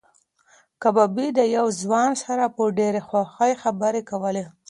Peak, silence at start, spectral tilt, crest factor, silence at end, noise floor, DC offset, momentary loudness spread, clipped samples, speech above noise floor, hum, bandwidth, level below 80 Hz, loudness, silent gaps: -4 dBFS; 0.8 s; -5 dB/octave; 18 dB; 0.2 s; -61 dBFS; under 0.1%; 6 LU; under 0.1%; 39 dB; none; 11.5 kHz; -70 dBFS; -22 LUFS; none